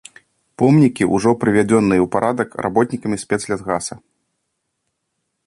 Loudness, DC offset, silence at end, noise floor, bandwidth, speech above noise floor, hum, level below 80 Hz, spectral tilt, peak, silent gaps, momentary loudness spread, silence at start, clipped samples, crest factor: -17 LUFS; under 0.1%; 1.5 s; -74 dBFS; 11.5 kHz; 57 dB; none; -50 dBFS; -6.5 dB/octave; -2 dBFS; none; 9 LU; 0.6 s; under 0.1%; 16 dB